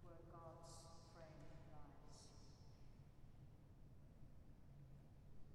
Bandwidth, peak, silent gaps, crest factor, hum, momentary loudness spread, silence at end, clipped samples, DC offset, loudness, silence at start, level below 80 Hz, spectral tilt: 12.5 kHz; -46 dBFS; none; 14 dB; none; 6 LU; 0 s; under 0.1%; under 0.1%; -64 LUFS; 0 s; -68 dBFS; -5.5 dB/octave